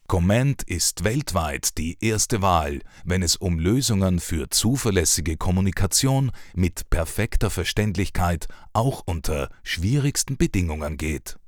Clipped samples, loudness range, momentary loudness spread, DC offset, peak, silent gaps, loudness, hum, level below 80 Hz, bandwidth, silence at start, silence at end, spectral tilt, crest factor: under 0.1%; 4 LU; 8 LU; under 0.1%; -6 dBFS; none; -23 LUFS; none; -32 dBFS; 19.5 kHz; 0.1 s; 0 s; -4.5 dB/octave; 18 dB